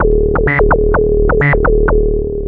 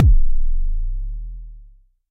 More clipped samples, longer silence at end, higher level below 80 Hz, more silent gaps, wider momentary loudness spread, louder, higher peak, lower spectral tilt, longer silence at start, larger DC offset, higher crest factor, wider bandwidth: neither; second, 0 s vs 0.5 s; about the same, -16 dBFS vs -18 dBFS; neither; second, 2 LU vs 18 LU; first, -12 LUFS vs -25 LUFS; about the same, 0 dBFS vs -2 dBFS; second, -11.5 dB/octave vs -13.5 dB/octave; about the same, 0 s vs 0 s; neither; about the same, 10 dB vs 14 dB; first, 3.5 kHz vs 0.5 kHz